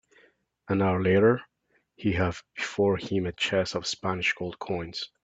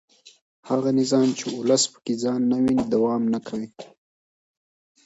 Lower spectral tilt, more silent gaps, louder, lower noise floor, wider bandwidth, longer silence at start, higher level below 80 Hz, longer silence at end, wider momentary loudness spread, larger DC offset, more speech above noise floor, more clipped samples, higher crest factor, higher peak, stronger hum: about the same, -5.5 dB/octave vs -4.5 dB/octave; second, none vs 0.42-0.63 s; second, -27 LUFS vs -23 LUFS; second, -63 dBFS vs under -90 dBFS; about the same, 8 kHz vs 8 kHz; first, 0.7 s vs 0.25 s; about the same, -58 dBFS vs -62 dBFS; second, 0.2 s vs 1.2 s; first, 11 LU vs 7 LU; neither; second, 36 dB vs over 68 dB; neither; about the same, 20 dB vs 16 dB; about the same, -8 dBFS vs -8 dBFS; neither